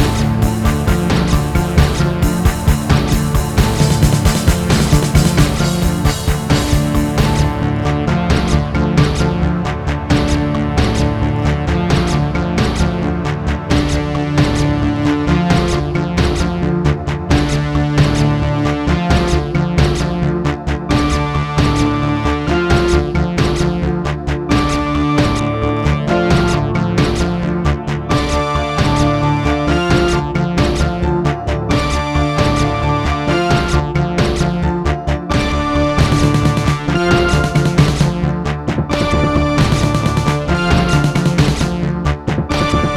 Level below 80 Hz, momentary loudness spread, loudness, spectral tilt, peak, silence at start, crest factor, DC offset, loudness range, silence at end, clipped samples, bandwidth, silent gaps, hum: -22 dBFS; 4 LU; -15 LUFS; -6 dB/octave; 0 dBFS; 0 s; 14 dB; under 0.1%; 2 LU; 0 s; under 0.1%; 17 kHz; none; none